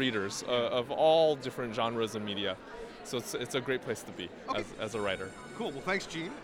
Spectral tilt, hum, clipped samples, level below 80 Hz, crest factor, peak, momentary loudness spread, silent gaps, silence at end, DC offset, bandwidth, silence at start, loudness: -4 dB/octave; none; under 0.1%; -62 dBFS; 20 dB; -14 dBFS; 13 LU; none; 0 s; under 0.1%; 17 kHz; 0 s; -33 LUFS